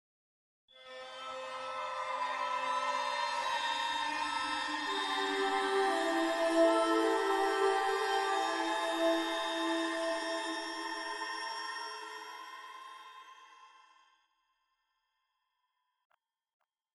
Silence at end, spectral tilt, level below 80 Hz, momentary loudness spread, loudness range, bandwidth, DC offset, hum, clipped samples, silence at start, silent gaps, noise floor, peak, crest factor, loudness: 3.3 s; -1 dB/octave; -76 dBFS; 16 LU; 13 LU; 12 kHz; under 0.1%; none; under 0.1%; 0.75 s; none; -83 dBFS; -16 dBFS; 20 dB; -33 LUFS